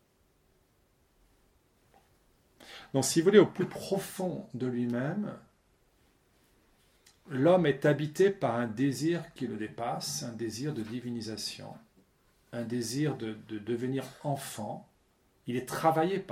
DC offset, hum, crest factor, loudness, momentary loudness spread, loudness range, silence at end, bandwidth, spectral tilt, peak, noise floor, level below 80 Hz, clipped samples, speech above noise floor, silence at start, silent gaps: under 0.1%; none; 26 dB; -31 LUFS; 15 LU; 8 LU; 0 s; 16.5 kHz; -5.5 dB/octave; -6 dBFS; -69 dBFS; -70 dBFS; under 0.1%; 39 dB; 2.6 s; none